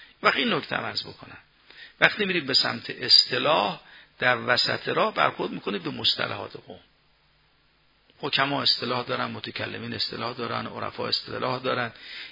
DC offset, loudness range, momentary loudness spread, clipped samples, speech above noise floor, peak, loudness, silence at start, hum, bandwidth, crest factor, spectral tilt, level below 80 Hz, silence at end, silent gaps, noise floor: under 0.1%; 7 LU; 11 LU; under 0.1%; 38 dB; 0 dBFS; -24 LUFS; 0 s; none; 6 kHz; 26 dB; -4 dB/octave; -68 dBFS; 0 s; none; -64 dBFS